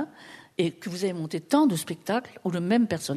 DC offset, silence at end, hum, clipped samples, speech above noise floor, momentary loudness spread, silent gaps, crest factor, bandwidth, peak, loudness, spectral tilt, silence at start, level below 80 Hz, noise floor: under 0.1%; 0 s; none; under 0.1%; 23 dB; 12 LU; none; 18 dB; 13.5 kHz; -8 dBFS; -27 LUFS; -5.5 dB/octave; 0 s; -70 dBFS; -49 dBFS